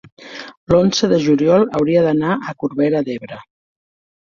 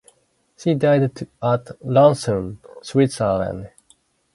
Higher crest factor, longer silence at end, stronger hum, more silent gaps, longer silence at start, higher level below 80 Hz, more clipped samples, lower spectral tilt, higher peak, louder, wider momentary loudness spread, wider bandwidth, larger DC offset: about the same, 16 dB vs 18 dB; about the same, 0.8 s vs 0.7 s; neither; first, 0.57-0.67 s vs none; second, 0.2 s vs 0.6 s; about the same, -48 dBFS vs -50 dBFS; neither; about the same, -6 dB/octave vs -7 dB/octave; about the same, -2 dBFS vs -2 dBFS; first, -16 LUFS vs -20 LUFS; first, 19 LU vs 13 LU; second, 7.2 kHz vs 11.5 kHz; neither